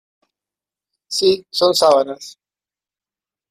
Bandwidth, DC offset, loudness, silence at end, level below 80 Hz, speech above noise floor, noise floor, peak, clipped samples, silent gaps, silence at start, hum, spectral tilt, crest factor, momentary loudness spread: 15.5 kHz; under 0.1%; -16 LUFS; 1.2 s; -62 dBFS; over 74 dB; under -90 dBFS; -2 dBFS; under 0.1%; none; 1.1 s; none; -3 dB/octave; 18 dB; 12 LU